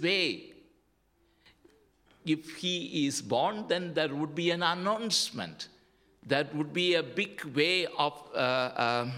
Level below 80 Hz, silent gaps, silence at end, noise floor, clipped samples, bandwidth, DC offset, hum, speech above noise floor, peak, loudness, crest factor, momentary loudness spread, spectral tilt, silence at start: -74 dBFS; none; 0 s; -70 dBFS; under 0.1%; 16 kHz; under 0.1%; none; 40 dB; -12 dBFS; -30 LUFS; 20 dB; 6 LU; -3.5 dB/octave; 0 s